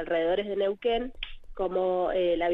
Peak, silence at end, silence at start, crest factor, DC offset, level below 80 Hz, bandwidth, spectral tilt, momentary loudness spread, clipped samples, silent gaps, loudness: -16 dBFS; 0 s; 0 s; 12 dB; under 0.1%; -46 dBFS; 5.2 kHz; -7.5 dB/octave; 11 LU; under 0.1%; none; -28 LUFS